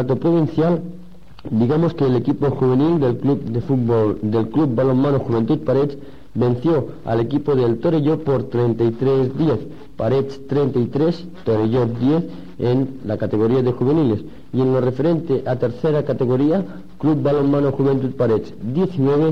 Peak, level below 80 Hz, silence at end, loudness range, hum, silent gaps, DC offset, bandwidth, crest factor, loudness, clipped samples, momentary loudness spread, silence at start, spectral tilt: -8 dBFS; -48 dBFS; 0 s; 2 LU; none; none; 2%; 6.6 kHz; 10 dB; -19 LUFS; under 0.1%; 6 LU; 0 s; -10 dB/octave